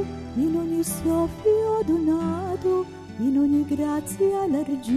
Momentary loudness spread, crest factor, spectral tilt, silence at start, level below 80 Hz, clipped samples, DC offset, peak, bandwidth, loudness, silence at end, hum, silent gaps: 5 LU; 12 dB; -6.5 dB/octave; 0 s; -48 dBFS; under 0.1%; under 0.1%; -12 dBFS; 14 kHz; -24 LUFS; 0 s; none; none